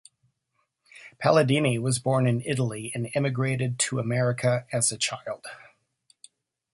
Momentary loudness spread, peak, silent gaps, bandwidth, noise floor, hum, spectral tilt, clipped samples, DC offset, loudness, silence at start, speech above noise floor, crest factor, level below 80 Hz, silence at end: 9 LU; -6 dBFS; none; 11.5 kHz; -76 dBFS; none; -4.5 dB/octave; under 0.1%; under 0.1%; -25 LUFS; 0.95 s; 51 dB; 20 dB; -64 dBFS; 1.15 s